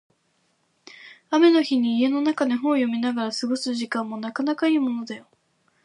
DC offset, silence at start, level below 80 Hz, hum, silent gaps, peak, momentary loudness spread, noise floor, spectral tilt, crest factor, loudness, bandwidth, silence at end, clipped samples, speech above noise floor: under 0.1%; 1 s; -78 dBFS; none; none; -6 dBFS; 12 LU; -68 dBFS; -4.5 dB/octave; 16 dB; -23 LUFS; 11 kHz; 0.65 s; under 0.1%; 46 dB